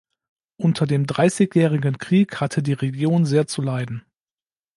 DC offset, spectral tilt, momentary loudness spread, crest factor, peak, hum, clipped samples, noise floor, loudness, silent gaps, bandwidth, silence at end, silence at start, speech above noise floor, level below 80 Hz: under 0.1%; -7 dB/octave; 7 LU; 16 dB; -4 dBFS; none; under 0.1%; under -90 dBFS; -20 LUFS; none; 11.5 kHz; 0.75 s; 0.6 s; over 71 dB; -62 dBFS